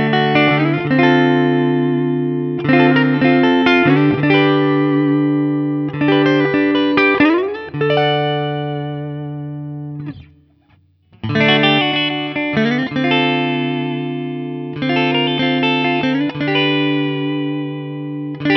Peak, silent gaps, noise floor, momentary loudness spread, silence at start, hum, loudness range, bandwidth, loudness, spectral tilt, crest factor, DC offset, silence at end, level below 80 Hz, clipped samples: 0 dBFS; none; -54 dBFS; 13 LU; 0 s; none; 6 LU; 6.2 kHz; -15 LUFS; -7.5 dB/octave; 16 dB; under 0.1%; 0 s; -54 dBFS; under 0.1%